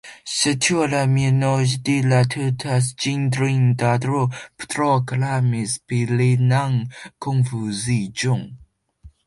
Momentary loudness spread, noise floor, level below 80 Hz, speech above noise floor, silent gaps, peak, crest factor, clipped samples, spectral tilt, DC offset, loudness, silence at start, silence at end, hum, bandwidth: 7 LU; -48 dBFS; -54 dBFS; 29 dB; none; -4 dBFS; 16 dB; under 0.1%; -5.5 dB/octave; under 0.1%; -20 LUFS; 0.05 s; 0.2 s; none; 11.5 kHz